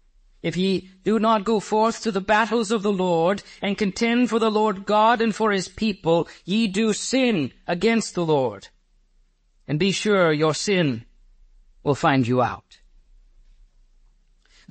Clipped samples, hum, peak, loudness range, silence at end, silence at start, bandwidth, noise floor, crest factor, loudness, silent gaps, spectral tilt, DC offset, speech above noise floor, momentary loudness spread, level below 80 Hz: under 0.1%; none; -6 dBFS; 4 LU; 2.1 s; 0.45 s; 8.8 kHz; -61 dBFS; 16 dB; -22 LUFS; none; -5 dB/octave; under 0.1%; 40 dB; 7 LU; -54 dBFS